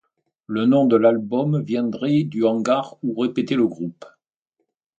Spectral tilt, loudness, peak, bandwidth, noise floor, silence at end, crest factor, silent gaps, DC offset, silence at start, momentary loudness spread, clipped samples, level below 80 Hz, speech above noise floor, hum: -8 dB/octave; -20 LUFS; -4 dBFS; 8 kHz; -76 dBFS; 0.9 s; 18 dB; none; under 0.1%; 0.5 s; 9 LU; under 0.1%; -68 dBFS; 56 dB; none